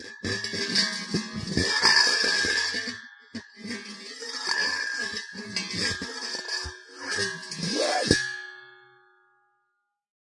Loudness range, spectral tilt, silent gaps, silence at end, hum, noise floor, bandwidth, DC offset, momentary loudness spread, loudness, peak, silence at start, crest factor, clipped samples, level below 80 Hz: 6 LU; -2 dB/octave; none; 1.45 s; none; -78 dBFS; 11.5 kHz; under 0.1%; 17 LU; -25 LUFS; -2 dBFS; 0 s; 26 dB; under 0.1%; -54 dBFS